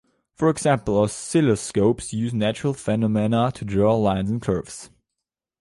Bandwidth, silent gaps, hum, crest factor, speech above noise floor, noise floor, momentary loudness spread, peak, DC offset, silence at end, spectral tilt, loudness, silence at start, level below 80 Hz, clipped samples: 11.5 kHz; none; none; 16 dB; 63 dB; -85 dBFS; 6 LU; -6 dBFS; under 0.1%; 0.75 s; -6 dB/octave; -22 LUFS; 0.4 s; -48 dBFS; under 0.1%